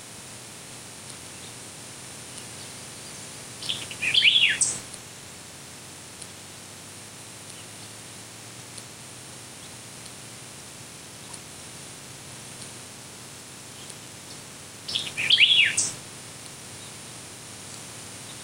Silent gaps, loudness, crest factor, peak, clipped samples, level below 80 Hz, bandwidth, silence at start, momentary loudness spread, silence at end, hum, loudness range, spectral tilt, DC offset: none; -21 LUFS; 26 dB; -6 dBFS; under 0.1%; -66 dBFS; 16 kHz; 0 s; 22 LU; 0 s; none; 17 LU; 0 dB/octave; under 0.1%